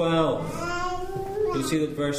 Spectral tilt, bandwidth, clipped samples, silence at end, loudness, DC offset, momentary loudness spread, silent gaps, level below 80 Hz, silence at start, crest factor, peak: -5.5 dB/octave; 15.5 kHz; under 0.1%; 0 s; -27 LUFS; under 0.1%; 7 LU; none; -42 dBFS; 0 s; 14 dB; -10 dBFS